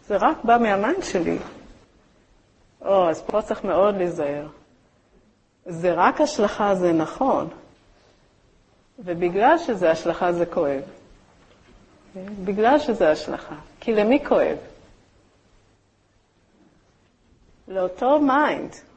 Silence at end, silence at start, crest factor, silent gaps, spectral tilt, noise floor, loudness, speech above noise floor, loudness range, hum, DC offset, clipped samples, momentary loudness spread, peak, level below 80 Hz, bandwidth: 0.15 s; 0.1 s; 20 dB; none; -5.5 dB/octave; -62 dBFS; -21 LUFS; 41 dB; 3 LU; none; under 0.1%; under 0.1%; 15 LU; -4 dBFS; -54 dBFS; 8.6 kHz